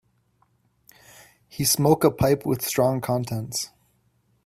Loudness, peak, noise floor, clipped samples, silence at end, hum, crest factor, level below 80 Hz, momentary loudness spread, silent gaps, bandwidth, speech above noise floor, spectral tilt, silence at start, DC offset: -23 LUFS; -4 dBFS; -66 dBFS; under 0.1%; 0.8 s; none; 22 dB; -52 dBFS; 11 LU; none; 16 kHz; 44 dB; -5 dB/octave; 1.55 s; under 0.1%